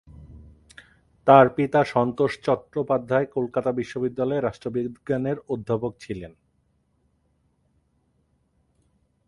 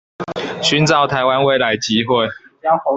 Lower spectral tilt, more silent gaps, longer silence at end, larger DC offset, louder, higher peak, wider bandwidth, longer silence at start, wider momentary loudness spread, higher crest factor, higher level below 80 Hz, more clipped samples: first, -7.5 dB/octave vs -4.5 dB/octave; neither; first, 3 s vs 0 s; neither; second, -23 LUFS vs -16 LUFS; about the same, 0 dBFS vs -2 dBFS; first, 11.5 kHz vs 8.4 kHz; about the same, 0.2 s vs 0.2 s; first, 14 LU vs 11 LU; first, 24 dB vs 16 dB; about the same, -56 dBFS vs -52 dBFS; neither